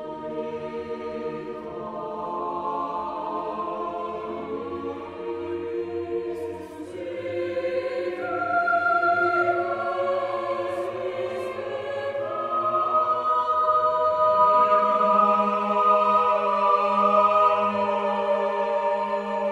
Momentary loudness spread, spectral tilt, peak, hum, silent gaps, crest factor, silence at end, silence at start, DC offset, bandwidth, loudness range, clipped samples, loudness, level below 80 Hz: 14 LU; -6 dB/octave; -8 dBFS; none; none; 16 dB; 0 s; 0 s; under 0.1%; 10.5 kHz; 11 LU; under 0.1%; -24 LUFS; -64 dBFS